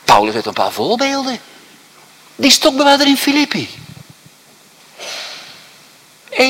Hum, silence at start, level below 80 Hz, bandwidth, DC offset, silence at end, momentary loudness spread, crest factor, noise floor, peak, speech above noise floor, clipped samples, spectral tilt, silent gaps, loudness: none; 0.05 s; -54 dBFS; 18.5 kHz; under 0.1%; 0 s; 19 LU; 16 dB; -46 dBFS; 0 dBFS; 32 dB; 0.1%; -2.5 dB/octave; none; -13 LUFS